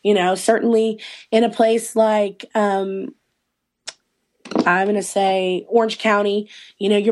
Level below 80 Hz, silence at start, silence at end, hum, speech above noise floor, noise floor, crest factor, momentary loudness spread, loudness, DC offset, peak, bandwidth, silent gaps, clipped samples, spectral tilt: -70 dBFS; 0.05 s; 0 s; none; 57 dB; -75 dBFS; 16 dB; 15 LU; -19 LUFS; under 0.1%; -4 dBFS; 12.5 kHz; none; under 0.1%; -4.5 dB/octave